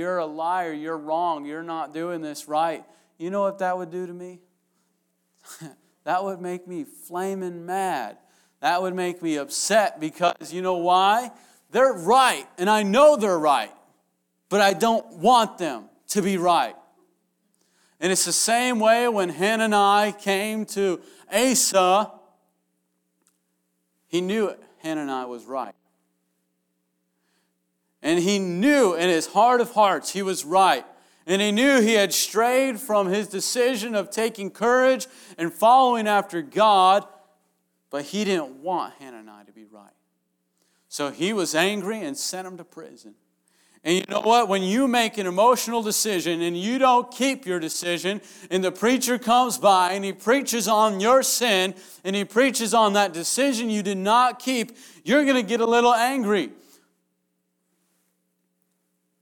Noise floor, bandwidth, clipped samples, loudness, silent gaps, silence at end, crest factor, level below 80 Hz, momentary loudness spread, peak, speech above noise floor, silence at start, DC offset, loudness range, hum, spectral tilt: -74 dBFS; over 20 kHz; under 0.1%; -22 LUFS; none; 2.7 s; 18 dB; -76 dBFS; 14 LU; -6 dBFS; 52 dB; 0 s; under 0.1%; 10 LU; none; -3 dB/octave